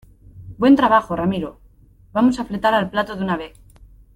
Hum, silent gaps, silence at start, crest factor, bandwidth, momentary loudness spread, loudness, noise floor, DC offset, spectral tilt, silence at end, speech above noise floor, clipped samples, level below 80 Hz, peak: none; none; 0.35 s; 16 dB; 12.5 kHz; 13 LU; -19 LUFS; -50 dBFS; under 0.1%; -7 dB/octave; 0.7 s; 32 dB; under 0.1%; -46 dBFS; -4 dBFS